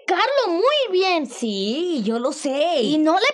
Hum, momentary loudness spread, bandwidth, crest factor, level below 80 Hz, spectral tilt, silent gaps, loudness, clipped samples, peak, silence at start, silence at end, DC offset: none; 5 LU; 11.5 kHz; 14 dB; -82 dBFS; -4 dB/octave; none; -20 LUFS; under 0.1%; -6 dBFS; 0.1 s; 0 s; under 0.1%